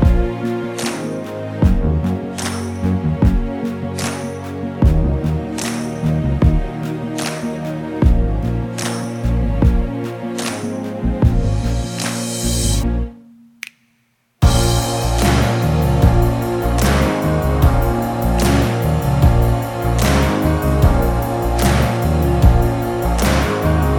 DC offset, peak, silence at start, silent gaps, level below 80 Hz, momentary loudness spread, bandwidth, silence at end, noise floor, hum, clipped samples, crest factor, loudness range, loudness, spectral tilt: under 0.1%; 0 dBFS; 0 s; none; -20 dBFS; 9 LU; 18 kHz; 0 s; -62 dBFS; none; under 0.1%; 16 dB; 4 LU; -18 LUFS; -6 dB/octave